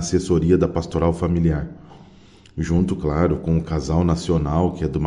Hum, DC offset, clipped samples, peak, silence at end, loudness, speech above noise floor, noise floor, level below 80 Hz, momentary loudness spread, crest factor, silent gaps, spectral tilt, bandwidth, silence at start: none; under 0.1%; under 0.1%; -4 dBFS; 0 s; -21 LUFS; 28 dB; -48 dBFS; -36 dBFS; 4 LU; 16 dB; none; -7.5 dB/octave; 10.5 kHz; 0 s